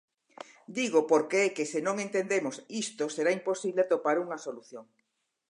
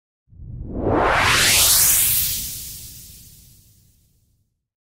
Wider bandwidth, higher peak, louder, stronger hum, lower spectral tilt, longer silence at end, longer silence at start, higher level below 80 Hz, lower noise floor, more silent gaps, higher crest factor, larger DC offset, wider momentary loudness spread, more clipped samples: second, 11 kHz vs 16.5 kHz; second, -12 dBFS vs -2 dBFS; second, -29 LUFS vs -15 LUFS; neither; first, -3.5 dB/octave vs -1 dB/octave; second, 0.65 s vs 1.6 s; first, 0.7 s vs 0.4 s; second, -86 dBFS vs -38 dBFS; first, -78 dBFS vs -67 dBFS; neither; about the same, 18 dB vs 20 dB; neither; about the same, 21 LU vs 22 LU; neither